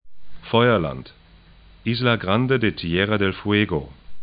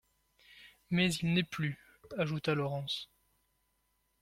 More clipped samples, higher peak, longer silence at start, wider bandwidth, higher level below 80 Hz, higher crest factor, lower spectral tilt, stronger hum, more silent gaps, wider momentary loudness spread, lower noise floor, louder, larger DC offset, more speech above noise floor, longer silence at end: neither; first, -2 dBFS vs -16 dBFS; second, 0.05 s vs 0.5 s; second, 5.2 kHz vs 15.5 kHz; first, -46 dBFS vs -66 dBFS; about the same, 20 dB vs 20 dB; first, -11 dB/octave vs -5.5 dB/octave; neither; neither; about the same, 11 LU vs 13 LU; second, -49 dBFS vs -78 dBFS; first, -21 LUFS vs -34 LUFS; neither; second, 28 dB vs 44 dB; second, 0 s vs 1.15 s